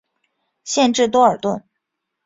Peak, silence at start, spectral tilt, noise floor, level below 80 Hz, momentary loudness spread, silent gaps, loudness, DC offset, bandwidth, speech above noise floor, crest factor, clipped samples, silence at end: -2 dBFS; 0.65 s; -3.5 dB/octave; -78 dBFS; -60 dBFS; 14 LU; none; -17 LUFS; under 0.1%; 7.8 kHz; 61 dB; 18 dB; under 0.1%; 0.65 s